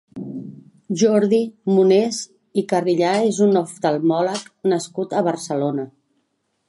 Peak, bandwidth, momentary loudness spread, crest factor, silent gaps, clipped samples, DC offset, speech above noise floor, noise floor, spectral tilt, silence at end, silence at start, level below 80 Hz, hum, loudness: -4 dBFS; 11.5 kHz; 14 LU; 16 dB; none; under 0.1%; under 0.1%; 51 dB; -70 dBFS; -5.5 dB/octave; 0.8 s; 0.15 s; -72 dBFS; none; -19 LUFS